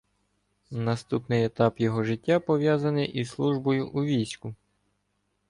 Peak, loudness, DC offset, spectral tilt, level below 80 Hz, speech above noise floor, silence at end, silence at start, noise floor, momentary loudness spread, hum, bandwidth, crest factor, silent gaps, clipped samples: -10 dBFS; -27 LUFS; under 0.1%; -7 dB/octave; -62 dBFS; 49 dB; 0.95 s; 0.7 s; -75 dBFS; 8 LU; 50 Hz at -60 dBFS; 11 kHz; 18 dB; none; under 0.1%